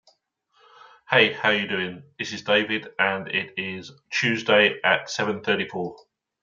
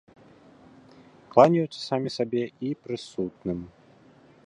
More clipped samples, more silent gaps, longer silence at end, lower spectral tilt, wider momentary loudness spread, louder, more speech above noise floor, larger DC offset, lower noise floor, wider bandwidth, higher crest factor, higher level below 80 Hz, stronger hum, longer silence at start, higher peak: neither; neither; second, 0.45 s vs 0.8 s; second, -4 dB/octave vs -7 dB/octave; about the same, 14 LU vs 15 LU; first, -23 LUFS vs -26 LUFS; first, 43 dB vs 30 dB; neither; first, -67 dBFS vs -55 dBFS; second, 7.6 kHz vs 11 kHz; about the same, 22 dB vs 26 dB; second, -72 dBFS vs -62 dBFS; neither; second, 1.1 s vs 1.3 s; about the same, -2 dBFS vs -2 dBFS